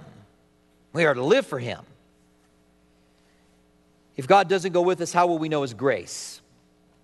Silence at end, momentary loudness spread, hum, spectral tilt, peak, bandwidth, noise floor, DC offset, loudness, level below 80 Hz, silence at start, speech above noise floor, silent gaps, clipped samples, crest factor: 0.65 s; 18 LU; none; -5 dB/octave; -4 dBFS; 12 kHz; -61 dBFS; under 0.1%; -23 LUFS; -68 dBFS; 0 s; 38 dB; none; under 0.1%; 22 dB